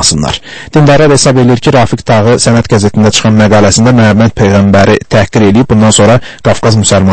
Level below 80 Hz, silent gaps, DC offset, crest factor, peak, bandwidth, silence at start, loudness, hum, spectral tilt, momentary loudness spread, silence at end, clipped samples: -30 dBFS; none; under 0.1%; 6 dB; 0 dBFS; 11 kHz; 0 s; -6 LUFS; none; -5 dB/octave; 4 LU; 0 s; 3%